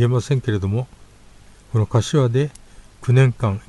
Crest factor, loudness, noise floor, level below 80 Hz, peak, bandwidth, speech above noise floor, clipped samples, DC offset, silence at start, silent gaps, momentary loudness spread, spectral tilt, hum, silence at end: 16 dB; -20 LUFS; -46 dBFS; -46 dBFS; -4 dBFS; 11.5 kHz; 28 dB; under 0.1%; under 0.1%; 0 s; none; 10 LU; -7 dB/octave; 50 Hz at -50 dBFS; 0.1 s